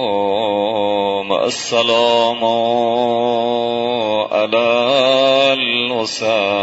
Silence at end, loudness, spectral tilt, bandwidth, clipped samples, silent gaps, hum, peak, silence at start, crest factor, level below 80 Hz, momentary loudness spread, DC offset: 0 s; -15 LUFS; -3.5 dB/octave; 8 kHz; under 0.1%; none; none; -2 dBFS; 0 s; 14 dB; -62 dBFS; 5 LU; under 0.1%